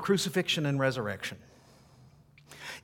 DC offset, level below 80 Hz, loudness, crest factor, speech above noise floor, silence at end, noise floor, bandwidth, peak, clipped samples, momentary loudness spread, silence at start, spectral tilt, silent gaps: under 0.1%; -66 dBFS; -30 LUFS; 20 dB; 28 dB; 0.05 s; -58 dBFS; 18 kHz; -12 dBFS; under 0.1%; 17 LU; 0 s; -4.5 dB/octave; none